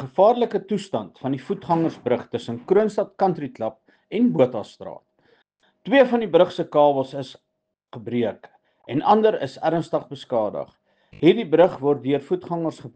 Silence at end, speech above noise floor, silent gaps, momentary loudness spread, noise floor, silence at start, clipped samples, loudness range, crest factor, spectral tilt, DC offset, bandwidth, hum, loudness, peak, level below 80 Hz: 0.05 s; 55 dB; none; 13 LU; -76 dBFS; 0 s; under 0.1%; 3 LU; 18 dB; -7.5 dB/octave; under 0.1%; 9 kHz; none; -22 LUFS; -4 dBFS; -66 dBFS